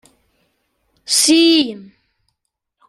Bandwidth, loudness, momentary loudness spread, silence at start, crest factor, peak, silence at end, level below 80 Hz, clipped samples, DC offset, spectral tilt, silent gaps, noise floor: 14 kHz; -13 LUFS; 14 LU; 1.1 s; 18 dB; -2 dBFS; 1.05 s; -66 dBFS; under 0.1%; under 0.1%; -1 dB/octave; none; -75 dBFS